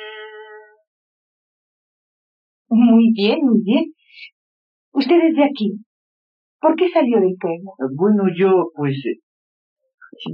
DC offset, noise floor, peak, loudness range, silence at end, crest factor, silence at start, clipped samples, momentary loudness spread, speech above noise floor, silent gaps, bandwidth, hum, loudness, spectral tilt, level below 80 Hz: under 0.1%; -41 dBFS; -4 dBFS; 3 LU; 0 s; 16 dB; 0 s; under 0.1%; 16 LU; 25 dB; 0.87-2.65 s, 4.32-4.92 s, 5.86-6.59 s, 9.23-9.76 s, 9.94-9.98 s; 5.4 kHz; none; -17 LUFS; -5.5 dB/octave; -80 dBFS